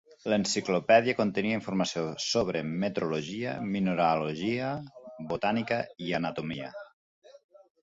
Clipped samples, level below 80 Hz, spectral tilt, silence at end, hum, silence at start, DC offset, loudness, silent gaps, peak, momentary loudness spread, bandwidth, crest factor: under 0.1%; -64 dBFS; -5 dB/octave; 0.45 s; none; 0.25 s; under 0.1%; -29 LUFS; 6.93-7.22 s; -10 dBFS; 13 LU; 8 kHz; 20 dB